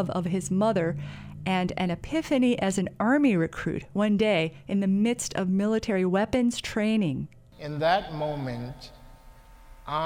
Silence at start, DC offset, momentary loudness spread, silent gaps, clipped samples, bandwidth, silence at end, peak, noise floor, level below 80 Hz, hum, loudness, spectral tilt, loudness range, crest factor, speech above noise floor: 0 s; under 0.1%; 13 LU; none; under 0.1%; 15.5 kHz; 0 s; -10 dBFS; -50 dBFS; -52 dBFS; none; -26 LUFS; -6 dB/octave; 3 LU; 18 dB; 24 dB